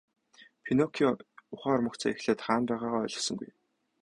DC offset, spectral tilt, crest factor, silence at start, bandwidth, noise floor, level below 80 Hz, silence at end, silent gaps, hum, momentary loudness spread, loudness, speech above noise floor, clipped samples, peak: under 0.1%; -4.5 dB/octave; 20 dB; 0.4 s; 11 kHz; -58 dBFS; -66 dBFS; 0.55 s; none; none; 12 LU; -30 LUFS; 28 dB; under 0.1%; -12 dBFS